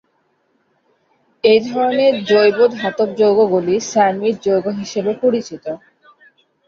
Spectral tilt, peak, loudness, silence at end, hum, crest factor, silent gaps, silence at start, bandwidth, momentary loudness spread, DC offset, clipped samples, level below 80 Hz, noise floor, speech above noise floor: -5 dB/octave; -2 dBFS; -15 LUFS; 0.9 s; none; 14 dB; none; 1.45 s; 7.4 kHz; 9 LU; under 0.1%; under 0.1%; -62 dBFS; -63 dBFS; 48 dB